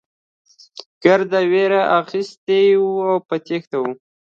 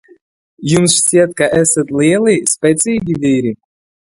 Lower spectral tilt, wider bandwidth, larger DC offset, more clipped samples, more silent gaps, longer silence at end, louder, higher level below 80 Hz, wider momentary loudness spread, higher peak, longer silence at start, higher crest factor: first, -6 dB/octave vs -4 dB/octave; second, 7.2 kHz vs 12 kHz; neither; neither; first, 0.86-1.01 s, 2.37-2.47 s, 3.67-3.71 s vs none; second, 0.4 s vs 0.6 s; second, -17 LUFS vs -12 LUFS; second, -70 dBFS vs -48 dBFS; first, 17 LU vs 7 LU; about the same, 0 dBFS vs 0 dBFS; first, 0.75 s vs 0.6 s; about the same, 18 dB vs 14 dB